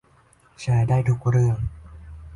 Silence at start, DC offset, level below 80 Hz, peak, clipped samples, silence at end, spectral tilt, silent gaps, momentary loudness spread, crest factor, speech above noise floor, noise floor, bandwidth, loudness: 0.6 s; under 0.1%; -40 dBFS; -10 dBFS; under 0.1%; 0 s; -8 dB/octave; none; 18 LU; 14 dB; 37 dB; -57 dBFS; 10.5 kHz; -22 LUFS